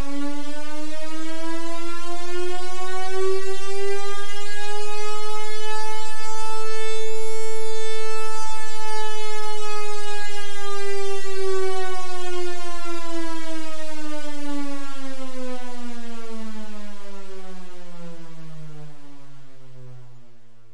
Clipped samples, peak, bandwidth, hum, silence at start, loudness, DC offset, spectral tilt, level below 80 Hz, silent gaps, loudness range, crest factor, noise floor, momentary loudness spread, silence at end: under 0.1%; -6 dBFS; 11.5 kHz; none; 0 s; -31 LUFS; 30%; -4.5 dB/octave; -54 dBFS; none; 10 LU; 6 dB; -50 dBFS; 14 LU; 0 s